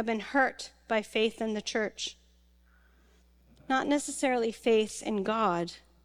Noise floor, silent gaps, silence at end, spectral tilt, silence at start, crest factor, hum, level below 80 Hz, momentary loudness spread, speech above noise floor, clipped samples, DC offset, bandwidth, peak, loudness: -63 dBFS; none; 0.25 s; -3.5 dB/octave; 0 s; 18 dB; none; -64 dBFS; 7 LU; 33 dB; under 0.1%; under 0.1%; 15 kHz; -14 dBFS; -30 LUFS